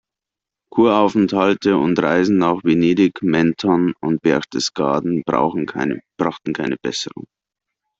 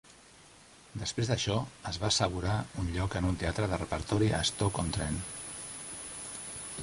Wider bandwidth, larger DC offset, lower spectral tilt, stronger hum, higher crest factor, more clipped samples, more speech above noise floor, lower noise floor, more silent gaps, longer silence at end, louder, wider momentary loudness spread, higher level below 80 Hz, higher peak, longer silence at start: second, 7.8 kHz vs 11.5 kHz; neither; first, -6 dB/octave vs -4.5 dB/octave; neither; about the same, 18 dB vs 22 dB; neither; first, 69 dB vs 25 dB; first, -86 dBFS vs -56 dBFS; neither; first, 0.9 s vs 0 s; first, -18 LUFS vs -33 LUFS; second, 8 LU vs 11 LU; second, -56 dBFS vs -46 dBFS; first, 0 dBFS vs -12 dBFS; first, 0.75 s vs 0.05 s